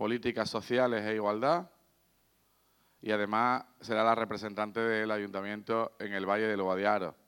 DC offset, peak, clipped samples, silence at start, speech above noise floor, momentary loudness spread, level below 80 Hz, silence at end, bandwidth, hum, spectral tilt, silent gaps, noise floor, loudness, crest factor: under 0.1%; -12 dBFS; under 0.1%; 0 s; 39 dB; 7 LU; -76 dBFS; 0.15 s; 18 kHz; none; -5.5 dB/octave; none; -71 dBFS; -32 LUFS; 20 dB